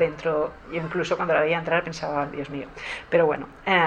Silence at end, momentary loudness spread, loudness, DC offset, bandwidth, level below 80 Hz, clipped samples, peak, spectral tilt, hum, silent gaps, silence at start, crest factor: 0 s; 11 LU; -25 LUFS; under 0.1%; 9.2 kHz; -52 dBFS; under 0.1%; -6 dBFS; -5.5 dB/octave; none; none; 0 s; 18 dB